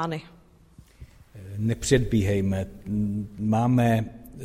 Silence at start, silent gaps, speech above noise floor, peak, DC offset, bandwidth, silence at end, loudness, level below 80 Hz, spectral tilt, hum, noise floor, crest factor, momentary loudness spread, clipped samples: 0 s; none; 29 dB; -6 dBFS; under 0.1%; 15.5 kHz; 0 s; -25 LUFS; -44 dBFS; -6.5 dB/octave; none; -53 dBFS; 20 dB; 14 LU; under 0.1%